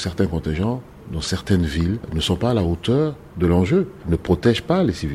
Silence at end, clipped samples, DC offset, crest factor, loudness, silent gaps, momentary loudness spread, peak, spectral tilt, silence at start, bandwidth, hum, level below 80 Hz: 0 s; under 0.1%; under 0.1%; 18 dB; -21 LUFS; none; 7 LU; -2 dBFS; -6.5 dB/octave; 0 s; 13.5 kHz; none; -34 dBFS